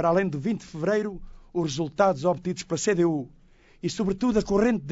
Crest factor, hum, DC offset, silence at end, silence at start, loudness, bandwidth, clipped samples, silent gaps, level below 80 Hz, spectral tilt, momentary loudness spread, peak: 16 dB; none; under 0.1%; 0 s; 0 s; -26 LUFS; 8 kHz; under 0.1%; none; -48 dBFS; -6 dB/octave; 11 LU; -10 dBFS